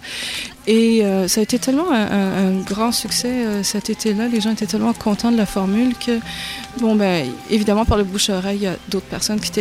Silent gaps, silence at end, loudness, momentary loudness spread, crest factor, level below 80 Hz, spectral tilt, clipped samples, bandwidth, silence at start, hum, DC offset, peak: none; 0 s; -19 LUFS; 6 LU; 16 dB; -38 dBFS; -4.5 dB/octave; under 0.1%; 16 kHz; 0 s; none; under 0.1%; -2 dBFS